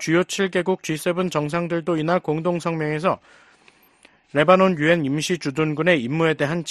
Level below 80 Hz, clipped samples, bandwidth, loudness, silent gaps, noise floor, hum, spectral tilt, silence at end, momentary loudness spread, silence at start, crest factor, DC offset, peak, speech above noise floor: -60 dBFS; under 0.1%; 13 kHz; -21 LUFS; none; -55 dBFS; none; -5.5 dB/octave; 0 s; 7 LU; 0 s; 20 dB; under 0.1%; -2 dBFS; 35 dB